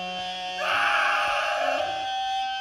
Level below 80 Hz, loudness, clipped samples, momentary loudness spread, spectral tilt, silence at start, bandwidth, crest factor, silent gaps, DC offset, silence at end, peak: -62 dBFS; -25 LUFS; under 0.1%; 9 LU; -1 dB/octave; 0 s; 14.5 kHz; 16 dB; none; under 0.1%; 0 s; -10 dBFS